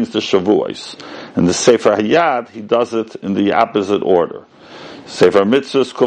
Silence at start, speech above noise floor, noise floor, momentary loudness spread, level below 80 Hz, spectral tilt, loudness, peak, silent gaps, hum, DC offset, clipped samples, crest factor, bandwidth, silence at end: 0 s; 20 dB; -35 dBFS; 18 LU; -58 dBFS; -5 dB/octave; -15 LUFS; 0 dBFS; none; none; under 0.1%; 0.2%; 16 dB; 9.6 kHz; 0 s